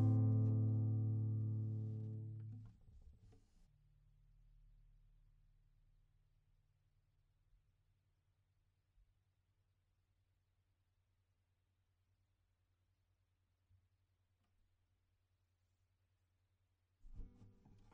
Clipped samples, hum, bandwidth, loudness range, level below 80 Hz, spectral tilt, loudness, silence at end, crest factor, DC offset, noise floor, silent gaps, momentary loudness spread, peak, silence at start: under 0.1%; none; 1.4 kHz; 20 LU; -70 dBFS; -13.5 dB/octave; -40 LUFS; 0.45 s; 20 dB; under 0.1%; -83 dBFS; none; 23 LU; -26 dBFS; 0 s